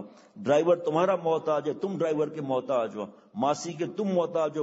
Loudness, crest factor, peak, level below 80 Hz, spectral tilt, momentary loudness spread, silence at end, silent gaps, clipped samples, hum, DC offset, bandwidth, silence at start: -28 LUFS; 16 dB; -10 dBFS; -78 dBFS; -6 dB/octave; 9 LU; 0 s; none; under 0.1%; none; under 0.1%; 8 kHz; 0 s